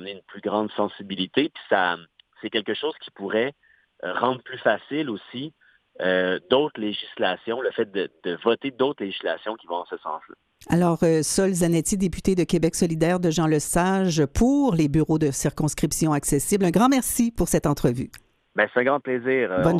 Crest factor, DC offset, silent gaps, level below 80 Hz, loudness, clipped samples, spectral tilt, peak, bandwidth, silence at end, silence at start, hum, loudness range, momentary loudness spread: 20 dB; under 0.1%; none; -44 dBFS; -23 LUFS; under 0.1%; -5 dB/octave; -4 dBFS; 14.5 kHz; 0 s; 0 s; none; 6 LU; 11 LU